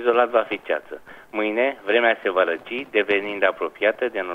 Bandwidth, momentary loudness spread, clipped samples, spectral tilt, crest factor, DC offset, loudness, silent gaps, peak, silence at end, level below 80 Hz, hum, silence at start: 5.8 kHz; 9 LU; under 0.1%; -5 dB/octave; 18 dB; under 0.1%; -22 LUFS; none; -4 dBFS; 0 s; -66 dBFS; none; 0 s